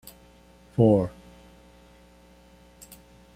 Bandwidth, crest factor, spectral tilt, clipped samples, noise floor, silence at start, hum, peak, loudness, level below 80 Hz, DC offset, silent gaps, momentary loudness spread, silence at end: 16 kHz; 22 dB; -9 dB/octave; under 0.1%; -54 dBFS; 0.8 s; 60 Hz at -50 dBFS; -8 dBFS; -23 LUFS; -54 dBFS; under 0.1%; none; 27 LU; 2.25 s